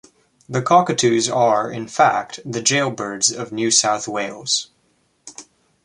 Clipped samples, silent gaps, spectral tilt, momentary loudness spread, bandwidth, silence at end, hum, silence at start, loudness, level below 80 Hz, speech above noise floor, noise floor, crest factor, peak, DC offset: under 0.1%; none; -2.5 dB/octave; 11 LU; 11.5 kHz; 0.4 s; none; 0.5 s; -18 LUFS; -64 dBFS; 45 dB; -63 dBFS; 18 dB; -2 dBFS; under 0.1%